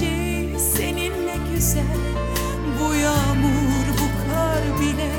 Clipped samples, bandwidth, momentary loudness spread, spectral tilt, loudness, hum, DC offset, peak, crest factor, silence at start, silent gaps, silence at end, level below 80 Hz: under 0.1%; 18 kHz; 5 LU; -5 dB/octave; -21 LUFS; none; under 0.1%; -8 dBFS; 14 dB; 0 s; none; 0 s; -28 dBFS